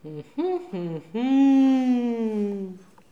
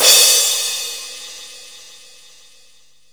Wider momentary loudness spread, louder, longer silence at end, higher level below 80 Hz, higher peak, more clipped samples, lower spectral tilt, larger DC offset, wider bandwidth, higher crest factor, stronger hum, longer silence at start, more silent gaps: second, 15 LU vs 27 LU; second, -23 LUFS vs -12 LUFS; second, 0.35 s vs 1.45 s; second, -74 dBFS vs -68 dBFS; second, -12 dBFS vs 0 dBFS; neither; first, -7.5 dB/octave vs 3.5 dB/octave; second, 0.1% vs 0.4%; second, 7.2 kHz vs over 20 kHz; second, 12 dB vs 18 dB; neither; about the same, 0.05 s vs 0 s; neither